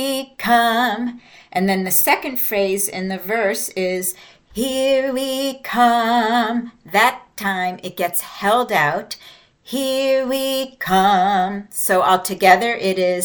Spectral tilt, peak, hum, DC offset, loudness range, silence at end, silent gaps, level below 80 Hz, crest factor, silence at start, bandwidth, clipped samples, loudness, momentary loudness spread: -3.5 dB/octave; 0 dBFS; none; under 0.1%; 3 LU; 0 s; none; -56 dBFS; 18 dB; 0 s; 19.5 kHz; under 0.1%; -18 LUFS; 10 LU